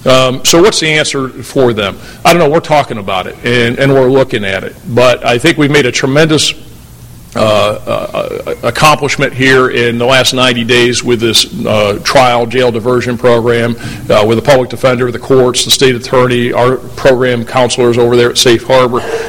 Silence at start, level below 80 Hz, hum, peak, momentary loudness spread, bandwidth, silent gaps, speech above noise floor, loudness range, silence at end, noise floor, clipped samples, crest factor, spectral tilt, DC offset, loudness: 0 s; -36 dBFS; none; 0 dBFS; 8 LU; 18 kHz; none; 23 dB; 2 LU; 0 s; -32 dBFS; 0.5%; 10 dB; -4 dB/octave; under 0.1%; -9 LUFS